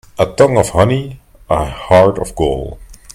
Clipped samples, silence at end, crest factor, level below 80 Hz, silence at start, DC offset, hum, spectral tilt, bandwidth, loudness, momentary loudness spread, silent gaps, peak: 0.1%; 0.2 s; 14 dB; -32 dBFS; 0.2 s; under 0.1%; none; -6 dB/octave; 15.5 kHz; -14 LUFS; 11 LU; none; 0 dBFS